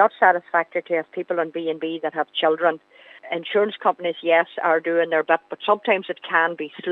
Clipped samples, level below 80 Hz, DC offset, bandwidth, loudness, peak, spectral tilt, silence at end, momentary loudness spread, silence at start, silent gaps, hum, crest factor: under 0.1%; -86 dBFS; under 0.1%; 4.2 kHz; -22 LUFS; -2 dBFS; -6.5 dB/octave; 0 s; 7 LU; 0 s; none; none; 20 dB